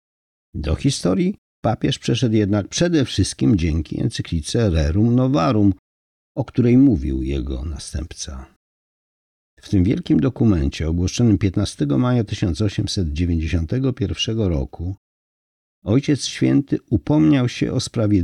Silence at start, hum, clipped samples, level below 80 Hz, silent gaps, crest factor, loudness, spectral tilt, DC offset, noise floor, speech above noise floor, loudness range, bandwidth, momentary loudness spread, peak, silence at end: 0.55 s; none; under 0.1%; -34 dBFS; 1.38-1.63 s, 5.79-6.35 s, 8.56-9.57 s, 14.98-15.82 s; 14 dB; -20 LUFS; -6.5 dB/octave; under 0.1%; under -90 dBFS; over 71 dB; 4 LU; 11.5 kHz; 12 LU; -6 dBFS; 0 s